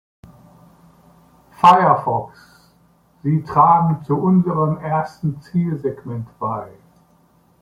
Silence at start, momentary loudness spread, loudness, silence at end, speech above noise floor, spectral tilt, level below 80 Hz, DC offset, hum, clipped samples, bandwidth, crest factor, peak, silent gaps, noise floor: 1.6 s; 15 LU; -18 LUFS; 0.9 s; 39 dB; -8.5 dB/octave; -56 dBFS; under 0.1%; none; under 0.1%; 11 kHz; 20 dB; 0 dBFS; none; -56 dBFS